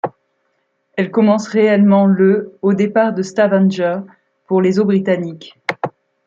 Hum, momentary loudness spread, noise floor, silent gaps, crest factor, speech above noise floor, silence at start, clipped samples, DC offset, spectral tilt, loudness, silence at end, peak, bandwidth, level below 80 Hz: none; 14 LU; -66 dBFS; none; 14 dB; 52 dB; 0.05 s; under 0.1%; under 0.1%; -7.5 dB/octave; -15 LUFS; 0.4 s; -2 dBFS; 7.6 kHz; -64 dBFS